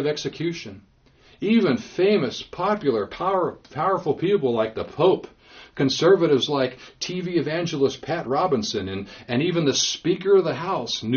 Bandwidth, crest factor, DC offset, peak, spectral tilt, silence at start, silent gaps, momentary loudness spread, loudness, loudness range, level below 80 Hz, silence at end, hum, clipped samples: 7 kHz; 18 dB; under 0.1%; -6 dBFS; -4.5 dB/octave; 0 s; none; 10 LU; -23 LUFS; 2 LU; -58 dBFS; 0 s; none; under 0.1%